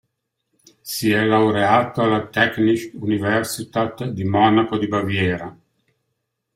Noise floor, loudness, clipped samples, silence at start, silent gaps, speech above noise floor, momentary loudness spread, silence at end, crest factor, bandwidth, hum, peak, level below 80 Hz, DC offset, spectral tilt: -75 dBFS; -19 LUFS; under 0.1%; 0.85 s; none; 57 dB; 9 LU; 1.05 s; 18 dB; 16 kHz; none; -2 dBFS; -58 dBFS; under 0.1%; -5.5 dB/octave